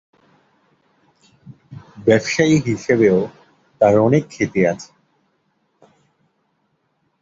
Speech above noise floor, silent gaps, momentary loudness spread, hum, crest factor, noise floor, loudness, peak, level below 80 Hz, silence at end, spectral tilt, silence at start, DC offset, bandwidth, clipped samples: 52 dB; none; 15 LU; none; 18 dB; -67 dBFS; -17 LUFS; -2 dBFS; -54 dBFS; 2.4 s; -6 dB/octave; 1.7 s; under 0.1%; 7.8 kHz; under 0.1%